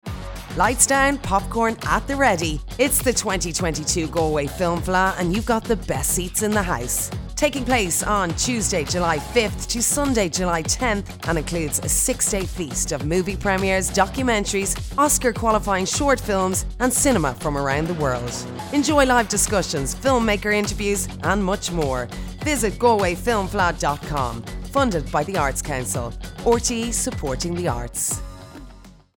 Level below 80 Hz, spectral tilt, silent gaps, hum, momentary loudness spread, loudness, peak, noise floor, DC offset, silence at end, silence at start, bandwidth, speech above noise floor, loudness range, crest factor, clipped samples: -34 dBFS; -3.5 dB/octave; none; none; 7 LU; -21 LUFS; -2 dBFS; -44 dBFS; under 0.1%; 0.25 s; 0.05 s; 19.5 kHz; 23 dB; 3 LU; 20 dB; under 0.1%